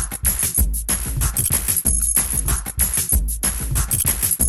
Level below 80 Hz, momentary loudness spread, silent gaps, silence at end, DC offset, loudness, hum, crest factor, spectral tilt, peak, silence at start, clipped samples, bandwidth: -26 dBFS; 5 LU; none; 0 s; under 0.1%; -18 LUFS; none; 16 dB; -2.5 dB/octave; -4 dBFS; 0 s; under 0.1%; 17.5 kHz